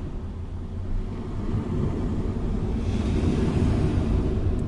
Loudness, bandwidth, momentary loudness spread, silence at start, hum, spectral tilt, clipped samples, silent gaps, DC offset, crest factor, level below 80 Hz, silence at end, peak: -27 LUFS; 11 kHz; 11 LU; 0 s; none; -8.5 dB/octave; under 0.1%; none; under 0.1%; 14 dB; -30 dBFS; 0 s; -10 dBFS